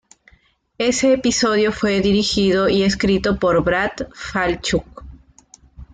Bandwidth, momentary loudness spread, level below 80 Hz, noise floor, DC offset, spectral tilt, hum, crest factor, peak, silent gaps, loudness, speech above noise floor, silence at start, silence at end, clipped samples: 9.4 kHz; 6 LU; -40 dBFS; -57 dBFS; under 0.1%; -4.5 dB/octave; none; 14 dB; -6 dBFS; none; -18 LUFS; 40 dB; 0.8 s; 0.1 s; under 0.1%